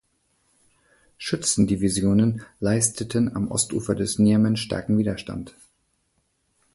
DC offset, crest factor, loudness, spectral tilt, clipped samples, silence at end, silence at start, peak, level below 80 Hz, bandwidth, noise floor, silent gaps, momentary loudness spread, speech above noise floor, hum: under 0.1%; 18 dB; -23 LUFS; -5 dB/octave; under 0.1%; 1.25 s; 1.2 s; -6 dBFS; -48 dBFS; 11.5 kHz; -70 dBFS; none; 11 LU; 48 dB; none